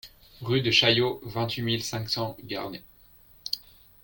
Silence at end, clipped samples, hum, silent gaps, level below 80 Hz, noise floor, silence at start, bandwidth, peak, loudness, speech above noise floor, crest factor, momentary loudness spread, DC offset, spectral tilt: 0.4 s; under 0.1%; none; none; -56 dBFS; -55 dBFS; 0.05 s; 17 kHz; -6 dBFS; -26 LUFS; 29 dB; 22 dB; 18 LU; under 0.1%; -4.5 dB/octave